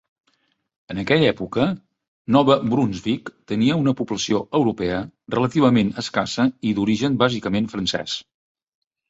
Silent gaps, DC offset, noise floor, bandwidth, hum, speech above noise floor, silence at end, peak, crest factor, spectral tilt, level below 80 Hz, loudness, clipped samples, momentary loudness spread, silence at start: 2.08-2.25 s; under 0.1%; -67 dBFS; 8 kHz; none; 47 dB; 0.9 s; -2 dBFS; 18 dB; -6 dB/octave; -52 dBFS; -21 LUFS; under 0.1%; 11 LU; 0.9 s